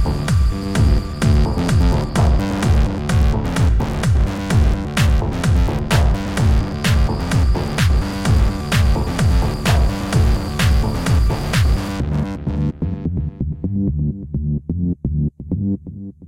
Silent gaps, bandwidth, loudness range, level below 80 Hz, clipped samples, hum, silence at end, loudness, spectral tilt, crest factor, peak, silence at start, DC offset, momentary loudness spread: none; 16 kHz; 5 LU; -20 dBFS; under 0.1%; none; 0 s; -18 LUFS; -6 dB/octave; 12 dB; -4 dBFS; 0 s; under 0.1%; 6 LU